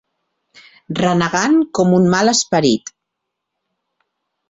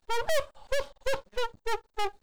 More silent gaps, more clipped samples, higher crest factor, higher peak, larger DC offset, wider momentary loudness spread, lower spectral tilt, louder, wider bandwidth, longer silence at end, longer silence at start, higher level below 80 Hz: neither; neither; about the same, 16 dB vs 12 dB; first, -2 dBFS vs -18 dBFS; neither; first, 9 LU vs 6 LU; first, -4.5 dB/octave vs -2 dB/octave; first, -15 LUFS vs -33 LUFS; second, 8.2 kHz vs over 20 kHz; first, 1.7 s vs 0 s; first, 0.9 s vs 0 s; second, -54 dBFS vs -46 dBFS